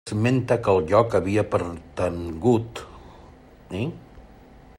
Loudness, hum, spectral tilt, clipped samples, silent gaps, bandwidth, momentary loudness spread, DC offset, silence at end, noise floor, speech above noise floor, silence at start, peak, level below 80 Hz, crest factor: -23 LUFS; none; -7.5 dB/octave; under 0.1%; none; 12.5 kHz; 16 LU; under 0.1%; 0.5 s; -48 dBFS; 26 dB; 0.05 s; -4 dBFS; -50 dBFS; 20 dB